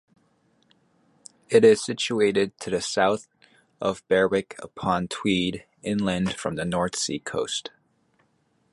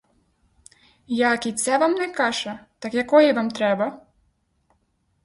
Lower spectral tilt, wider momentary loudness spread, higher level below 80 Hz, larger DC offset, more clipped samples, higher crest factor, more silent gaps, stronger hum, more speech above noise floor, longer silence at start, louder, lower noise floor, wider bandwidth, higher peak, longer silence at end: about the same, -4.5 dB/octave vs -3.5 dB/octave; about the same, 11 LU vs 12 LU; first, -56 dBFS vs -64 dBFS; neither; neither; about the same, 20 dB vs 20 dB; neither; neither; about the same, 44 dB vs 47 dB; first, 1.5 s vs 1.1 s; second, -24 LUFS vs -21 LUFS; about the same, -68 dBFS vs -68 dBFS; about the same, 11.5 kHz vs 11.5 kHz; about the same, -6 dBFS vs -4 dBFS; second, 1.05 s vs 1.25 s